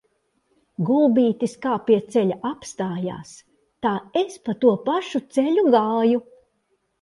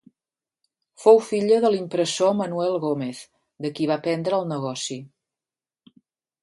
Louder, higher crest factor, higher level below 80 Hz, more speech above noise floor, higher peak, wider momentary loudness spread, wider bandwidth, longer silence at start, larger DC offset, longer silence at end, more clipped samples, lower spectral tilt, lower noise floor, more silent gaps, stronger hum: about the same, -22 LUFS vs -22 LUFS; about the same, 18 dB vs 22 dB; first, -66 dBFS vs -74 dBFS; second, 49 dB vs over 68 dB; about the same, -4 dBFS vs -2 dBFS; second, 11 LU vs 15 LU; about the same, 11.5 kHz vs 11.5 kHz; second, 0.8 s vs 1 s; neither; second, 0.8 s vs 1.35 s; neither; first, -6.5 dB/octave vs -5 dB/octave; second, -70 dBFS vs under -90 dBFS; neither; neither